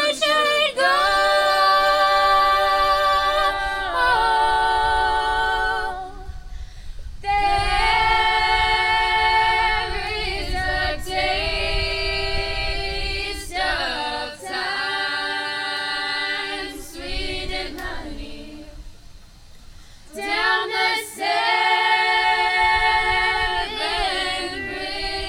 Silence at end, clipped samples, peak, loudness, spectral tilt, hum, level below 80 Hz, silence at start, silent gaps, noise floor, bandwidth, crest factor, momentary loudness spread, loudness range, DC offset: 0 s; under 0.1%; -6 dBFS; -20 LUFS; -2.5 dB/octave; none; -34 dBFS; 0 s; none; -43 dBFS; 16.5 kHz; 16 dB; 14 LU; 9 LU; under 0.1%